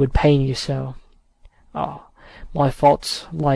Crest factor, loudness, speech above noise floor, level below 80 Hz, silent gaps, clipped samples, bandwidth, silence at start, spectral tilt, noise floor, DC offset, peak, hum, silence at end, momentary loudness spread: 18 dB; -20 LUFS; 32 dB; -34 dBFS; none; under 0.1%; 11 kHz; 0 s; -6.5 dB/octave; -51 dBFS; under 0.1%; -2 dBFS; none; 0 s; 16 LU